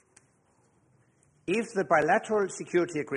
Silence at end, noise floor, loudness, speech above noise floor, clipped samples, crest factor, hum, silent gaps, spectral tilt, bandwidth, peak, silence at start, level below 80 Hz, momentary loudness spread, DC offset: 0 s; -67 dBFS; -27 LUFS; 40 dB; under 0.1%; 18 dB; none; none; -5 dB/octave; 11 kHz; -10 dBFS; 1.45 s; -70 dBFS; 7 LU; under 0.1%